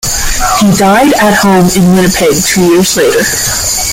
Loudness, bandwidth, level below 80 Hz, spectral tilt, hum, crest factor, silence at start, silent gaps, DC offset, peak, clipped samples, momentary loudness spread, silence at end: -7 LUFS; 17.5 kHz; -24 dBFS; -4 dB/octave; none; 8 dB; 0.05 s; none; under 0.1%; 0 dBFS; under 0.1%; 4 LU; 0 s